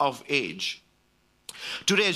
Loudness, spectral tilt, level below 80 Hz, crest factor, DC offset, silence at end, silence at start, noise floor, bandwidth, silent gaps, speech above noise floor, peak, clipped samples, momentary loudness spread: -27 LUFS; -2.5 dB/octave; -70 dBFS; 20 dB; under 0.1%; 0 s; 0 s; -66 dBFS; 14.5 kHz; none; 40 dB; -8 dBFS; under 0.1%; 19 LU